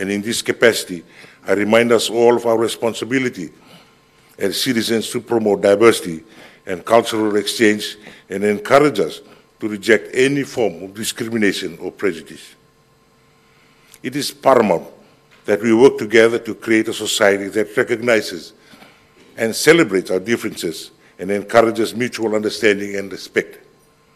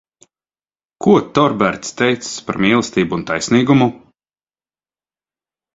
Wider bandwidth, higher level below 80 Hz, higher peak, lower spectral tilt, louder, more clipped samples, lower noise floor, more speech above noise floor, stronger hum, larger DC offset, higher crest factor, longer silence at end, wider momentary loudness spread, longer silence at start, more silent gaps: first, 15 kHz vs 8 kHz; second, -60 dBFS vs -52 dBFS; about the same, 0 dBFS vs 0 dBFS; second, -4 dB/octave vs -5.5 dB/octave; about the same, -17 LUFS vs -16 LUFS; first, 0.1% vs under 0.1%; second, -54 dBFS vs under -90 dBFS; second, 37 dB vs over 75 dB; second, none vs 50 Hz at -50 dBFS; neither; about the same, 18 dB vs 18 dB; second, 0.6 s vs 1.8 s; first, 16 LU vs 7 LU; second, 0 s vs 1 s; neither